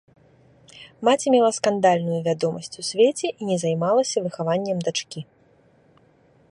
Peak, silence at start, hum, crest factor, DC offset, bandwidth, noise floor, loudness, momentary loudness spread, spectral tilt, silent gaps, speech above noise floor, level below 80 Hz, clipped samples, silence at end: -4 dBFS; 0.75 s; none; 18 dB; under 0.1%; 11.5 kHz; -58 dBFS; -22 LUFS; 9 LU; -4.5 dB/octave; none; 36 dB; -68 dBFS; under 0.1%; 1.25 s